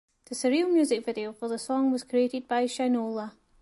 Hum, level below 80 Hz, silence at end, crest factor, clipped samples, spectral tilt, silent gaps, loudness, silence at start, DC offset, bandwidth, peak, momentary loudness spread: none; -72 dBFS; 0.3 s; 14 dB; under 0.1%; -4 dB/octave; none; -28 LUFS; 0.3 s; under 0.1%; 11.5 kHz; -14 dBFS; 10 LU